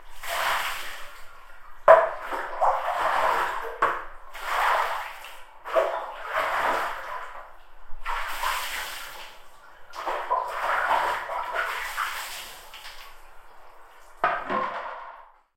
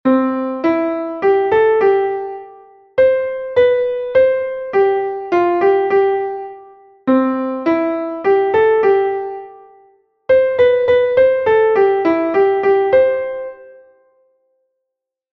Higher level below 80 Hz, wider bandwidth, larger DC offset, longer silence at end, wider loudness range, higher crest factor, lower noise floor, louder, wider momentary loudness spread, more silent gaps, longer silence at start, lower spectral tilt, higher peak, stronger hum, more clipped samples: first, -48 dBFS vs -54 dBFS; first, 16.5 kHz vs 5.8 kHz; neither; second, 0.3 s vs 1.6 s; first, 9 LU vs 3 LU; first, 26 dB vs 14 dB; second, -47 dBFS vs -80 dBFS; second, -26 LUFS vs -15 LUFS; first, 18 LU vs 12 LU; neither; about the same, 0 s vs 0.05 s; second, -1.5 dB/octave vs -7.5 dB/octave; about the same, -2 dBFS vs -2 dBFS; neither; neither